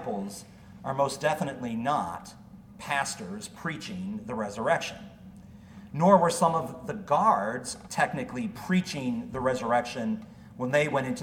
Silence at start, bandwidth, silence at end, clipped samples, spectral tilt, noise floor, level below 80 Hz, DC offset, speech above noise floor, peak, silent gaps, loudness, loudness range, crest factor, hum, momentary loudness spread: 0 s; 16.5 kHz; 0 s; under 0.1%; -5 dB/octave; -48 dBFS; -60 dBFS; under 0.1%; 20 dB; -6 dBFS; none; -28 LUFS; 7 LU; 22 dB; none; 18 LU